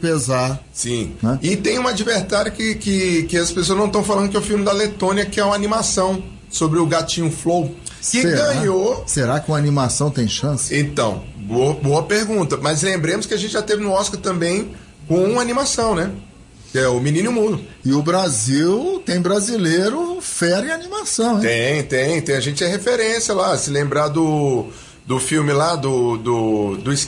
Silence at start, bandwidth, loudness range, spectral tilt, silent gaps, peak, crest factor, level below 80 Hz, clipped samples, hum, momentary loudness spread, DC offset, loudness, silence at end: 0 s; 12 kHz; 1 LU; -4.5 dB/octave; none; -8 dBFS; 12 dB; -44 dBFS; under 0.1%; none; 5 LU; under 0.1%; -18 LUFS; 0 s